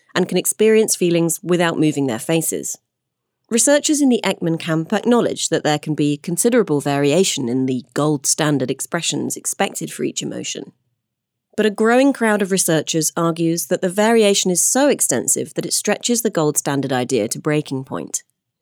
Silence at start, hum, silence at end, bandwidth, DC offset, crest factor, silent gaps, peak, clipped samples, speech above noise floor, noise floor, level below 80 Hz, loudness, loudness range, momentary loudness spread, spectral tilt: 0.15 s; none; 0.4 s; over 20 kHz; under 0.1%; 16 dB; none; -2 dBFS; under 0.1%; 61 dB; -78 dBFS; -70 dBFS; -18 LUFS; 4 LU; 9 LU; -4 dB/octave